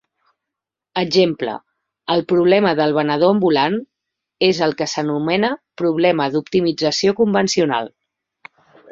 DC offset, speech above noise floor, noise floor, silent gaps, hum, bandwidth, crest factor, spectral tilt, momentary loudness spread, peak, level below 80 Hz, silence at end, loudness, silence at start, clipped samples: under 0.1%; 67 dB; -84 dBFS; none; none; 7.8 kHz; 16 dB; -5 dB/octave; 9 LU; -2 dBFS; -60 dBFS; 1.05 s; -17 LUFS; 0.95 s; under 0.1%